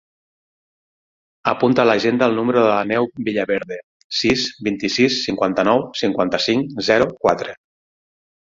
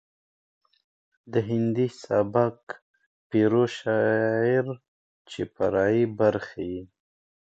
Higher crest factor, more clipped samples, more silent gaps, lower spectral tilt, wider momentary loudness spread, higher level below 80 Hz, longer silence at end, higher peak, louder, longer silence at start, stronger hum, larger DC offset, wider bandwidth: about the same, 18 dB vs 20 dB; neither; second, 3.83-4.10 s vs 2.63-2.67 s, 2.82-2.94 s, 3.06-3.30 s, 4.88-5.25 s; second, -4.5 dB/octave vs -7.5 dB/octave; second, 8 LU vs 15 LU; first, -54 dBFS vs -60 dBFS; first, 0.95 s vs 0.6 s; first, -2 dBFS vs -8 dBFS; first, -18 LUFS vs -25 LUFS; first, 1.45 s vs 1.25 s; neither; neither; about the same, 7.8 kHz vs 8 kHz